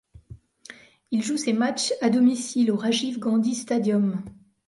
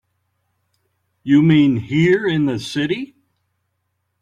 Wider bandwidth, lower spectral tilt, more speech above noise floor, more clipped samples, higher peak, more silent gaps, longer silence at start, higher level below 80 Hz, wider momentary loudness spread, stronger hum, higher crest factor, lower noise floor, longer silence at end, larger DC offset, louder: about the same, 11.5 kHz vs 10.5 kHz; second, -4.5 dB/octave vs -7 dB/octave; second, 25 dB vs 56 dB; neither; second, -10 dBFS vs -4 dBFS; neither; second, 0.15 s vs 1.25 s; about the same, -60 dBFS vs -56 dBFS; second, 7 LU vs 12 LU; neither; about the same, 14 dB vs 16 dB; second, -48 dBFS vs -72 dBFS; second, 0.35 s vs 1.15 s; neither; second, -24 LUFS vs -17 LUFS